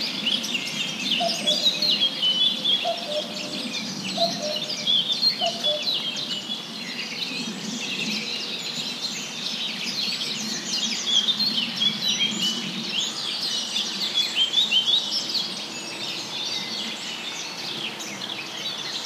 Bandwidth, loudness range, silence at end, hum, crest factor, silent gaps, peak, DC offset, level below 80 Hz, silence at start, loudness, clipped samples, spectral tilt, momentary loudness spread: 15.5 kHz; 6 LU; 0 s; none; 18 dB; none; -10 dBFS; under 0.1%; -78 dBFS; 0 s; -23 LUFS; under 0.1%; -1.5 dB/octave; 10 LU